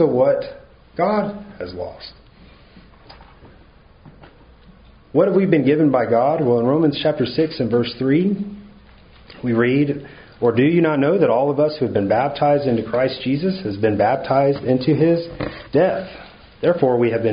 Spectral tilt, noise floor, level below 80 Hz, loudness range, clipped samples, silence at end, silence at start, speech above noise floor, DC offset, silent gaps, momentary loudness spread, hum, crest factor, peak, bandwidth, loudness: -6 dB/octave; -48 dBFS; -50 dBFS; 10 LU; under 0.1%; 0 s; 0 s; 30 dB; under 0.1%; none; 14 LU; none; 18 dB; -2 dBFS; 5.2 kHz; -18 LUFS